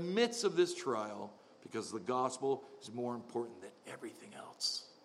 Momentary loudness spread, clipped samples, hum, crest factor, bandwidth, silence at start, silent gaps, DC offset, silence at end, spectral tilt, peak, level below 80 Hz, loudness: 18 LU; under 0.1%; none; 20 dB; 13.5 kHz; 0 s; none; under 0.1%; 0.1 s; -3.5 dB/octave; -18 dBFS; -90 dBFS; -38 LUFS